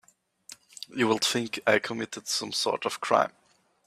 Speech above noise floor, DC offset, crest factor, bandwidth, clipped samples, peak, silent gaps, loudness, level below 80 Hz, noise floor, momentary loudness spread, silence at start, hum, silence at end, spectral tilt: 27 dB; under 0.1%; 22 dB; 15.5 kHz; under 0.1%; -6 dBFS; none; -27 LUFS; -72 dBFS; -54 dBFS; 18 LU; 0.5 s; none; 0.6 s; -2.5 dB/octave